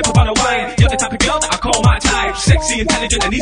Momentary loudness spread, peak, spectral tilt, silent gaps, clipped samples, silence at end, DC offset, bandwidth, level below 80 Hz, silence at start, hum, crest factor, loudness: 3 LU; 0 dBFS; -4 dB/octave; none; under 0.1%; 0 s; 0.2%; 10.5 kHz; -22 dBFS; 0 s; none; 14 dB; -14 LUFS